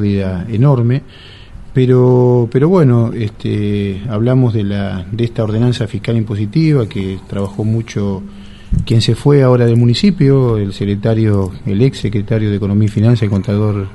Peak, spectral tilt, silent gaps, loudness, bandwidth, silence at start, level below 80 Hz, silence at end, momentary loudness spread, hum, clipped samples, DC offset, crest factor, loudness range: 0 dBFS; -8 dB/octave; none; -14 LUFS; 11.5 kHz; 0 s; -34 dBFS; 0 s; 10 LU; none; under 0.1%; under 0.1%; 12 dB; 4 LU